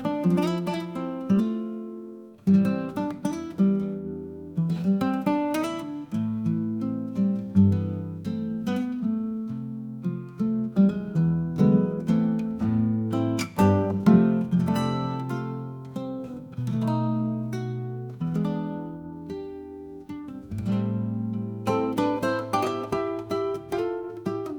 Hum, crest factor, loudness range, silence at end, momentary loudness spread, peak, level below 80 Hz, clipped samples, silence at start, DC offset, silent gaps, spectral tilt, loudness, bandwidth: none; 18 dB; 7 LU; 0 s; 14 LU; -6 dBFS; -60 dBFS; under 0.1%; 0 s; under 0.1%; none; -8 dB/octave; -26 LUFS; 18 kHz